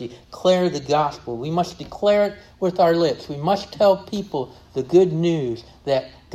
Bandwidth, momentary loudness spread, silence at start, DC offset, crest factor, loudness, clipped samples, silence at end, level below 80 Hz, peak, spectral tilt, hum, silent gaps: 13.5 kHz; 11 LU; 0 s; under 0.1%; 16 dB; -21 LUFS; under 0.1%; 0 s; -52 dBFS; -4 dBFS; -6.5 dB/octave; none; none